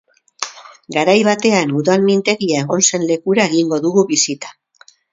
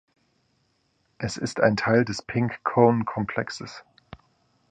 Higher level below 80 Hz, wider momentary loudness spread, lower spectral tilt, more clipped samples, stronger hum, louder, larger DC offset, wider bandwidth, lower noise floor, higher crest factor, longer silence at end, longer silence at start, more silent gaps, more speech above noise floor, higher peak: second, -62 dBFS vs -56 dBFS; about the same, 14 LU vs 15 LU; second, -3.5 dB/octave vs -6 dB/octave; neither; neither; first, -15 LUFS vs -24 LUFS; neither; second, 7.8 kHz vs 9.8 kHz; second, -50 dBFS vs -69 dBFS; second, 16 dB vs 22 dB; about the same, 0.6 s vs 0.55 s; second, 0.4 s vs 1.2 s; neither; second, 35 dB vs 46 dB; first, 0 dBFS vs -4 dBFS